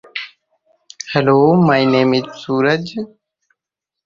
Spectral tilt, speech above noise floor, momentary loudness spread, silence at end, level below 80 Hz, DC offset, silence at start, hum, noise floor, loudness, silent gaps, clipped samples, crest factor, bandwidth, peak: -6.5 dB/octave; 70 dB; 18 LU; 1 s; -58 dBFS; under 0.1%; 0.15 s; none; -84 dBFS; -15 LUFS; none; under 0.1%; 16 dB; 7.4 kHz; 0 dBFS